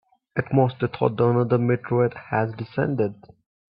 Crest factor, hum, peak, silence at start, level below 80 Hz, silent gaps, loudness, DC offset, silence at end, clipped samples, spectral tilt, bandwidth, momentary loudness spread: 18 dB; none; -4 dBFS; 0.35 s; -60 dBFS; none; -23 LUFS; under 0.1%; 0.6 s; under 0.1%; -12.5 dB/octave; 5.2 kHz; 7 LU